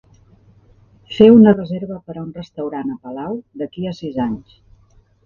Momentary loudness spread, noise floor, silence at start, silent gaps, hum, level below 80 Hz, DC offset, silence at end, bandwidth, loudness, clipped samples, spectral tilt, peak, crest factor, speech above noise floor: 21 LU; -53 dBFS; 1.1 s; none; none; -52 dBFS; under 0.1%; 0.85 s; 5.4 kHz; -16 LUFS; under 0.1%; -9 dB/octave; 0 dBFS; 18 dB; 37 dB